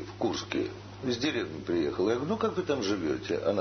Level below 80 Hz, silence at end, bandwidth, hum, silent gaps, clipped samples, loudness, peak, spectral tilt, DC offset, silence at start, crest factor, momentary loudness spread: -58 dBFS; 0 s; 6.6 kHz; none; none; under 0.1%; -31 LUFS; -12 dBFS; -5.5 dB/octave; under 0.1%; 0 s; 18 dB; 5 LU